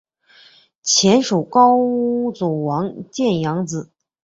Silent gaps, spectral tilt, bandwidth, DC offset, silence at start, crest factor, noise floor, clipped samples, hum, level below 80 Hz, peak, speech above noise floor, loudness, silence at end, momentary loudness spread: none; -4.5 dB/octave; 8 kHz; under 0.1%; 0.85 s; 16 dB; -50 dBFS; under 0.1%; none; -60 dBFS; -2 dBFS; 33 dB; -17 LUFS; 0.4 s; 13 LU